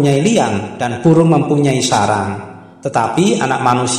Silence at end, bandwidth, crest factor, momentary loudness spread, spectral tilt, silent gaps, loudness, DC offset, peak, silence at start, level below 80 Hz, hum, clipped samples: 0 s; 14.5 kHz; 14 dB; 11 LU; -5.5 dB/octave; none; -14 LUFS; under 0.1%; 0 dBFS; 0 s; -52 dBFS; none; under 0.1%